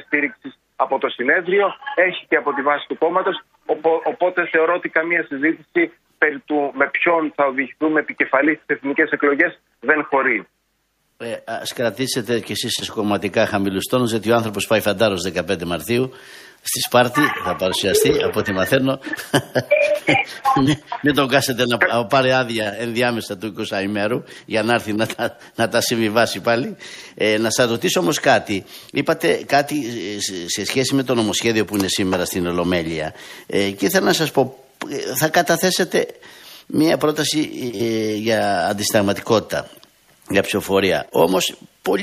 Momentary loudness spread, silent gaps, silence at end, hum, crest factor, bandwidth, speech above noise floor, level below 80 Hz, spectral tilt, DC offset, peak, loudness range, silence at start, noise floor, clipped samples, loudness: 9 LU; none; 0 s; none; 18 dB; 15.5 kHz; 48 dB; -54 dBFS; -4 dB/octave; under 0.1%; 0 dBFS; 2 LU; 0.1 s; -67 dBFS; under 0.1%; -19 LUFS